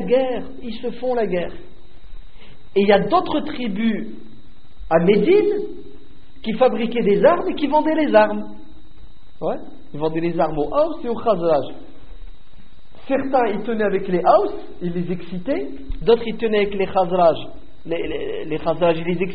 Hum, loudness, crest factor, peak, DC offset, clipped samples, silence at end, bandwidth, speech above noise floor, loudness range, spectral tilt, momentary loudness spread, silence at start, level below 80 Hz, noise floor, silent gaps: none; -20 LUFS; 20 dB; -2 dBFS; 4%; under 0.1%; 0 s; 5 kHz; 27 dB; 4 LU; -5 dB/octave; 14 LU; 0 s; -42 dBFS; -46 dBFS; none